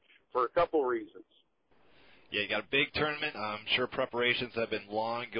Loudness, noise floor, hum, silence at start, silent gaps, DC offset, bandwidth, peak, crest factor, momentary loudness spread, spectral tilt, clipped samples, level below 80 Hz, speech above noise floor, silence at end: -31 LUFS; -68 dBFS; none; 0.35 s; none; under 0.1%; 5.4 kHz; -14 dBFS; 20 dB; 8 LU; -8 dB/octave; under 0.1%; -64 dBFS; 36 dB; 0 s